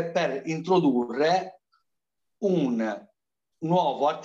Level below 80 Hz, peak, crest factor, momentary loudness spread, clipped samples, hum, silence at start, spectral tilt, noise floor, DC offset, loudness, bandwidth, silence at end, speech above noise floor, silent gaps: -76 dBFS; -10 dBFS; 16 dB; 10 LU; under 0.1%; none; 0 s; -6.5 dB/octave; -85 dBFS; under 0.1%; -26 LUFS; 7.6 kHz; 0 s; 61 dB; none